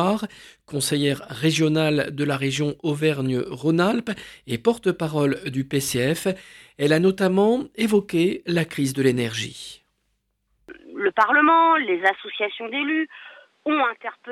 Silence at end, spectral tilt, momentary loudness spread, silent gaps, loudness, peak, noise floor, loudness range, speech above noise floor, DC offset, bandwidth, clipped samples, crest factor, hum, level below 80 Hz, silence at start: 0 s; -5 dB/octave; 13 LU; none; -22 LUFS; -4 dBFS; -72 dBFS; 3 LU; 50 dB; under 0.1%; 16 kHz; under 0.1%; 18 dB; none; -60 dBFS; 0 s